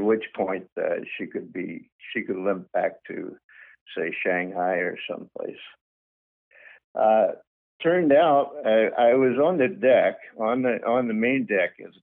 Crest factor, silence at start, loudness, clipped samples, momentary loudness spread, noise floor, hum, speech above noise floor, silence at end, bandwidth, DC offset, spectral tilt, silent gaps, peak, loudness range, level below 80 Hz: 16 dB; 0 s; -24 LUFS; under 0.1%; 17 LU; under -90 dBFS; none; over 66 dB; 0.15 s; 3.9 kHz; under 0.1%; -4 dB/octave; 0.72-0.76 s, 1.92-1.99 s, 3.44-3.49 s, 3.81-3.86 s, 5.81-6.51 s, 6.84-6.95 s, 7.47-7.79 s; -8 dBFS; 9 LU; -74 dBFS